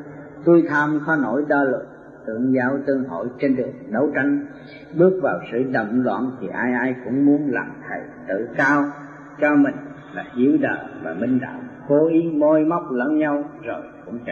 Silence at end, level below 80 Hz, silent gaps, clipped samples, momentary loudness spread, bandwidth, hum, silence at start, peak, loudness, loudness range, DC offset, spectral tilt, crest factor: 0 s; -62 dBFS; none; under 0.1%; 15 LU; 7 kHz; none; 0 s; -4 dBFS; -20 LUFS; 2 LU; under 0.1%; -8.5 dB/octave; 18 dB